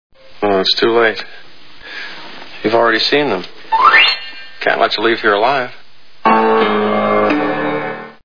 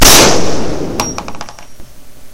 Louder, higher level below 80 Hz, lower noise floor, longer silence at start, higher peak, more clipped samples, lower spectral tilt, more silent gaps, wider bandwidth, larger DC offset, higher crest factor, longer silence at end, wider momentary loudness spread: about the same, -13 LUFS vs -11 LUFS; second, -58 dBFS vs -22 dBFS; first, -35 dBFS vs -30 dBFS; about the same, 0.1 s vs 0 s; about the same, 0 dBFS vs 0 dBFS; second, under 0.1% vs 2%; first, -5 dB/octave vs -2 dB/octave; neither; second, 5.4 kHz vs over 20 kHz; first, 3% vs under 0.1%; first, 16 dB vs 10 dB; about the same, 0 s vs 0 s; second, 17 LU vs 24 LU